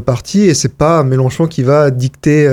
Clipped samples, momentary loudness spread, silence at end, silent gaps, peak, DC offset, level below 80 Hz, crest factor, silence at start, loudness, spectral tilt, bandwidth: under 0.1%; 4 LU; 0 s; none; 0 dBFS; under 0.1%; -40 dBFS; 10 dB; 0 s; -12 LUFS; -6 dB/octave; 14 kHz